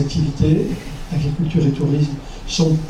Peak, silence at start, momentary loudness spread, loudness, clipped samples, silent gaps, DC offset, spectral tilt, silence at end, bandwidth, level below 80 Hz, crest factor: -2 dBFS; 0 s; 8 LU; -19 LUFS; under 0.1%; none; under 0.1%; -7 dB/octave; 0 s; 10.5 kHz; -32 dBFS; 16 dB